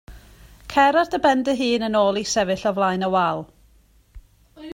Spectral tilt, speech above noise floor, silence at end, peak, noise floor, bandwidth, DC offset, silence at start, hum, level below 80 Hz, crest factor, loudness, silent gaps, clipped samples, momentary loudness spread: -4 dB/octave; 36 dB; 0 s; -4 dBFS; -56 dBFS; 16.5 kHz; under 0.1%; 0.1 s; none; -50 dBFS; 18 dB; -20 LUFS; none; under 0.1%; 5 LU